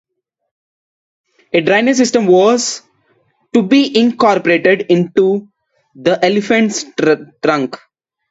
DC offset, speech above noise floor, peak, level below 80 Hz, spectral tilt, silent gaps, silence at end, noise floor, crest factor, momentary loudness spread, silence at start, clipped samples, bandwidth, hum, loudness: under 0.1%; 46 dB; 0 dBFS; -60 dBFS; -4.5 dB/octave; none; 0.55 s; -58 dBFS; 14 dB; 8 LU; 1.55 s; under 0.1%; 8 kHz; none; -13 LUFS